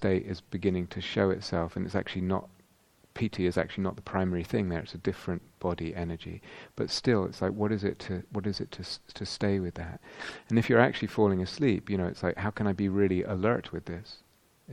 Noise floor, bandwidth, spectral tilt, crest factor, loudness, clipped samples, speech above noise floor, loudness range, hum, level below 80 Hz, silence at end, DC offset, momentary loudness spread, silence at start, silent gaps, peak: -64 dBFS; 12 kHz; -6.5 dB/octave; 26 dB; -30 LUFS; under 0.1%; 34 dB; 5 LU; none; -54 dBFS; 0 s; under 0.1%; 13 LU; 0 s; none; -6 dBFS